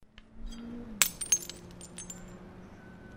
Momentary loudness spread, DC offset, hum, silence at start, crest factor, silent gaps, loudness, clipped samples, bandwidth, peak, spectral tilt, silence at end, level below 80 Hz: 23 LU; under 0.1%; none; 0 s; 36 dB; none; -29 LUFS; under 0.1%; 16 kHz; 0 dBFS; -0.5 dB/octave; 0 s; -52 dBFS